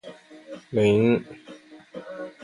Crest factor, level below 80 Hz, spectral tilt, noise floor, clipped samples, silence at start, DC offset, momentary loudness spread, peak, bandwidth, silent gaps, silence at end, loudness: 16 dB; -60 dBFS; -7.5 dB/octave; -47 dBFS; under 0.1%; 0.05 s; under 0.1%; 25 LU; -10 dBFS; 11.5 kHz; none; 0.15 s; -22 LUFS